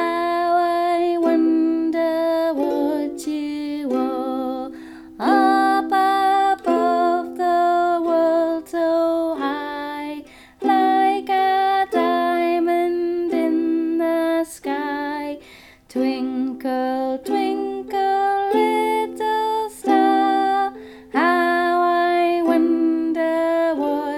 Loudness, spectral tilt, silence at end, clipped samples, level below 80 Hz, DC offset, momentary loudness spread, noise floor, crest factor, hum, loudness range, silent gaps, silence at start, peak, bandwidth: -20 LUFS; -4 dB/octave; 0 s; under 0.1%; -60 dBFS; under 0.1%; 9 LU; -46 dBFS; 14 dB; none; 5 LU; none; 0 s; -4 dBFS; 14.5 kHz